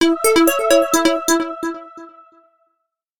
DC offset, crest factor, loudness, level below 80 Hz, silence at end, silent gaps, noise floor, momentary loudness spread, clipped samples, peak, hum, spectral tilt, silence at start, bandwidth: under 0.1%; 16 dB; -16 LUFS; -54 dBFS; 1.1 s; none; -73 dBFS; 13 LU; under 0.1%; -2 dBFS; none; -1.5 dB/octave; 0 s; 19 kHz